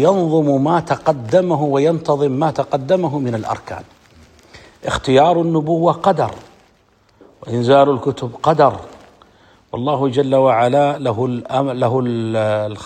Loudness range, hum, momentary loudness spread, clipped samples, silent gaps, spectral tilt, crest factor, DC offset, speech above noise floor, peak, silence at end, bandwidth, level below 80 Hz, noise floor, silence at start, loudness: 3 LU; none; 10 LU; under 0.1%; none; -7 dB/octave; 16 dB; under 0.1%; 39 dB; 0 dBFS; 0 s; 9.4 kHz; -50 dBFS; -55 dBFS; 0 s; -16 LUFS